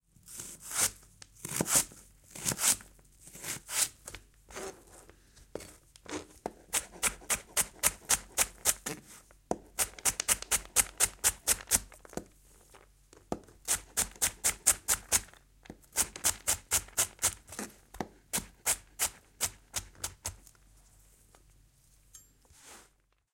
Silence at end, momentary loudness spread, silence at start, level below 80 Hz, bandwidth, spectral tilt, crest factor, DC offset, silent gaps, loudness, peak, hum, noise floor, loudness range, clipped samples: 0.55 s; 18 LU; 0.25 s; -56 dBFS; 17 kHz; -0.5 dB/octave; 30 dB; under 0.1%; none; -30 LUFS; -6 dBFS; none; -69 dBFS; 9 LU; under 0.1%